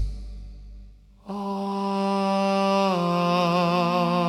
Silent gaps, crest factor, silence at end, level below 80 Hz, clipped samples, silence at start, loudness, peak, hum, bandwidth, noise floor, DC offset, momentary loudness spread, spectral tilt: none; 16 dB; 0 s; -42 dBFS; under 0.1%; 0 s; -23 LUFS; -8 dBFS; none; 13 kHz; -47 dBFS; under 0.1%; 17 LU; -6.5 dB/octave